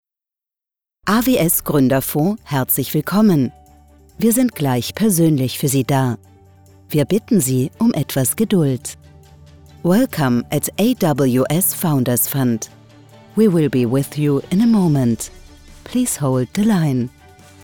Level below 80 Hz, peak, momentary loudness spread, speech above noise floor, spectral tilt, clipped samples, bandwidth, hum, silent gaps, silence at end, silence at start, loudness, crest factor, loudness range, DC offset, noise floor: -48 dBFS; -4 dBFS; 8 LU; 72 dB; -5.5 dB/octave; under 0.1%; over 20 kHz; none; none; 0.55 s; 1.05 s; -17 LUFS; 14 dB; 2 LU; under 0.1%; -88 dBFS